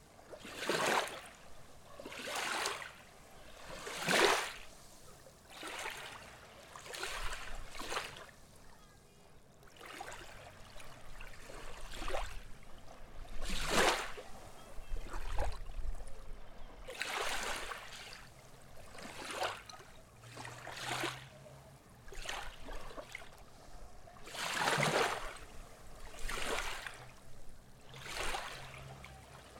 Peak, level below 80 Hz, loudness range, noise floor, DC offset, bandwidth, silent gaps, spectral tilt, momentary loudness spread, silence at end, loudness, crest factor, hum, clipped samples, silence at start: -10 dBFS; -50 dBFS; 11 LU; -60 dBFS; under 0.1%; 18 kHz; none; -2.5 dB/octave; 24 LU; 0 s; -39 LUFS; 30 dB; none; under 0.1%; 0 s